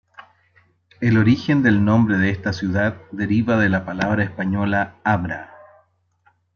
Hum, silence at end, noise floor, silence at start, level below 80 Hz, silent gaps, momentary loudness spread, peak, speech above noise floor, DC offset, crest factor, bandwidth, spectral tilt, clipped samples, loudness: none; 1.1 s; -62 dBFS; 0.2 s; -52 dBFS; none; 8 LU; -4 dBFS; 43 dB; under 0.1%; 16 dB; 6.8 kHz; -8 dB/octave; under 0.1%; -19 LUFS